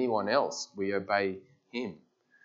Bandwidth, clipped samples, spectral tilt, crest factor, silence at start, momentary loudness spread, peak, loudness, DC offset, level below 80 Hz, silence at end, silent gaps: 8 kHz; under 0.1%; -4 dB/octave; 20 dB; 0 s; 13 LU; -12 dBFS; -32 LUFS; under 0.1%; -82 dBFS; 0.5 s; none